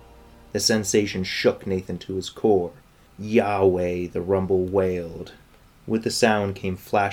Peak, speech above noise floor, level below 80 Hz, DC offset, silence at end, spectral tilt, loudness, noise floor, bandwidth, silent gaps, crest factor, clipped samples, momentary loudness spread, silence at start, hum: -4 dBFS; 26 dB; -54 dBFS; under 0.1%; 0 s; -4.5 dB/octave; -23 LUFS; -48 dBFS; 18 kHz; none; 20 dB; under 0.1%; 11 LU; 0.55 s; none